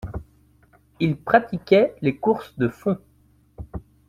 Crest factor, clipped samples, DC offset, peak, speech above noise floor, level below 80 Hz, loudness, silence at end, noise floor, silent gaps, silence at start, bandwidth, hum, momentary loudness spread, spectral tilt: 22 dB; under 0.1%; under 0.1%; -2 dBFS; 38 dB; -46 dBFS; -22 LUFS; 0.3 s; -58 dBFS; none; 0.05 s; 14.5 kHz; none; 20 LU; -8 dB/octave